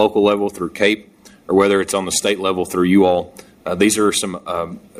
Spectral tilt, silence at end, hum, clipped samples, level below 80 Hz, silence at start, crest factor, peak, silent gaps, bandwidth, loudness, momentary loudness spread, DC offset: -4 dB/octave; 0 s; none; under 0.1%; -52 dBFS; 0 s; 16 dB; -2 dBFS; none; 15.5 kHz; -17 LUFS; 10 LU; under 0.1%